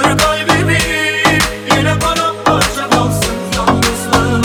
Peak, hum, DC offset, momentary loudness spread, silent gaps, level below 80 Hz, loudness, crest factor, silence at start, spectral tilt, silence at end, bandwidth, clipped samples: 0 dBFS; none; under 0.1%; 3 LU; none; -30 dBFS; -12 LUFS; 12 dB; 0 s; -4 dB/octave; 0 s; over 20 kHz; under 0.1%